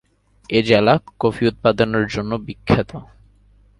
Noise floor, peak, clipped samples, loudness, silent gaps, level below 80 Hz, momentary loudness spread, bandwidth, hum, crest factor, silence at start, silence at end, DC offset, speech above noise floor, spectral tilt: -52 dBFS; 0 dBFS; under 0.1%; -18 LUFS; none; -44 dBFS; 12 LU; 11.5 kHz; 50 Hz at -40 dBFS; 20 dB; 0.5 s; 0.75 s; under 0.1%; 34 dB; -7 dB/octave